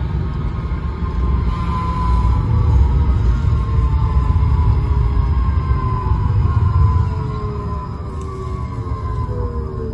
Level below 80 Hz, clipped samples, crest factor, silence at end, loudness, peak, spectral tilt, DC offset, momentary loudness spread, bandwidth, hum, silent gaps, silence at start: -20 dBFS; under 0.1%; 14 dB; 0 s; -19 LUFS; -2 dBFS; -9 dB/octave; under 0.1%; 9 LU; 5.4 kHz; none; none; 0 s